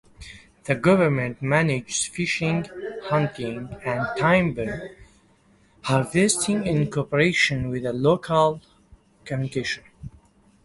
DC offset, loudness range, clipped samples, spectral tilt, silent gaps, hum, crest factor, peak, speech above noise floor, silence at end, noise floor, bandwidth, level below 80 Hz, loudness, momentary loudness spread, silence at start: under 0.1%; 4 LU; under 0.1%; -5 dB/octave; none; none; 20 dB; -4 dBFS; 36 dB; 0.55 s; -58 dBFS; 11.5 kHz; -52 dBFS; -23 LUFS; 16 LU; 0.2 s